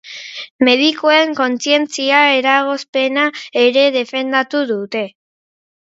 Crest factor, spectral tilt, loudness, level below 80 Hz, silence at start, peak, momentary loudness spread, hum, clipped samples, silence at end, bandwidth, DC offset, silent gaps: 16 dB; -2.5 dB/octave; -14 LUFS; -70 dBFS; 0.05 s; 0 dBFS; 11 LU; none; under 0.1%; 0.75 s; 8 kHz; under 0.1%; 0.50-0.59 s, 2.89-2.93 s